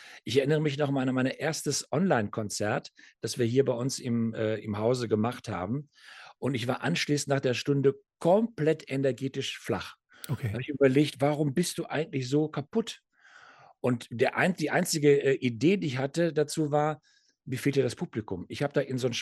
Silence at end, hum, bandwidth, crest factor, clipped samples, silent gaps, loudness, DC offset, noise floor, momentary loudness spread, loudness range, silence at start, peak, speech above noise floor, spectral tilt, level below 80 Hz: 0 s; none; 13 kHz; 18 dB; under 0.1%; none; -29 LUFS; under 0.1%; -56 dBFS; 10 LU; 3 LU; 0 s; -10 dBFS; 28 dB; -5.5 dB/octave; -68 dBFS